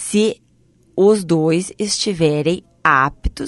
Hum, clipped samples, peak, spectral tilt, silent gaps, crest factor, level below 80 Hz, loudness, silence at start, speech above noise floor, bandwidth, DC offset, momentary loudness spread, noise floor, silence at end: none; under 0.1%; 0 dBFS; -4.5 dB/octave; none; 18 dB; -36 dBFS; -17 LUFS; 0 s; 39 dB; 11.5 kHz; under 0.1%; 6 LU; -54 dBFS; 0 s